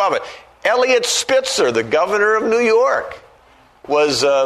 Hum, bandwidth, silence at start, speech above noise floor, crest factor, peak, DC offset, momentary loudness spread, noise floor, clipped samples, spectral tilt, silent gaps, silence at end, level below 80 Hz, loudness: none; 13.5 kHz; 0 s; 34 dB; 14 dB; -2 dBFS; under 0.1%; 8 LU; -50 dBFS; under 0.1%; -2 dB/octave; none; 0 s; -56 dBFS; -16 LUFS